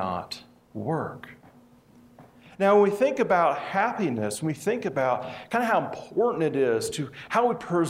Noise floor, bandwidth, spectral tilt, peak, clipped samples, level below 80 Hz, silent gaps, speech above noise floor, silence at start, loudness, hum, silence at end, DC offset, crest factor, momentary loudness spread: -55 dBFS; 16 kHz; -5.5 dB/octave; -8 dBFS; under 0.1%; -66 dBFS; none; 30 dB; 0 s; -25 LUFS; none; 0 s; under 0.1%; 18 dB; 12 LU